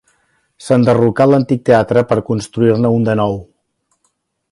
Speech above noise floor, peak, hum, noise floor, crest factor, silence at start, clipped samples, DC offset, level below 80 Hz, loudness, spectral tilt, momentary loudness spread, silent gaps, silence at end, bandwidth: 53 dB; 0 dBFS; none; -66 dBFS; 14 dB; 0.6 s; under 0.1%; under 0.1%; -48 dBFS; -13 LUFS; -7.5 dB/octave; 8 LU; none; 1.1 s; 11.5 kHz